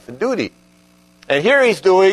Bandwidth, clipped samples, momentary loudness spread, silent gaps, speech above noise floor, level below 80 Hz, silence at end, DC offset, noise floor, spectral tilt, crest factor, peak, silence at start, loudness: 12.5 kHz; under 0.1%; 10 LU; none; 37 dB; -60 dBFS; 0 s; under 0.1%; -51 dBFS; -4.5 dB/octave; 16 dB; -2 dBFS; 0.1 s; -15 LUFS